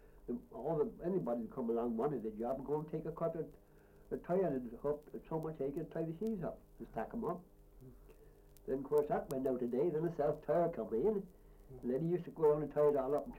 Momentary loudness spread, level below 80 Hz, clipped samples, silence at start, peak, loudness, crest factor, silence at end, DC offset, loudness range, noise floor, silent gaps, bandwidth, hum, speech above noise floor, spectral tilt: 12 LU; -62 dBFS; under 0.1%; 0.05 s; -22 dBFS; -38 LUFS; 16 dB; 0 s; under 0.1%; 6 LU; -61 dBFS; none; 16.5 kHz; none; 23 dB; -9 dB/octave